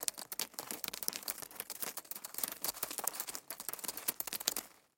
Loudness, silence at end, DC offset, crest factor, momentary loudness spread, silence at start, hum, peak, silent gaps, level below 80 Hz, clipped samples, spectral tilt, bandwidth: -39 LUFS; 0.2 s; under 0.1%; 36 dB; 6 LU; 0 s; none; -6 dBFS; none; -78 dBFS; under 0.1%; 0.5 dB/octave; 17 kHz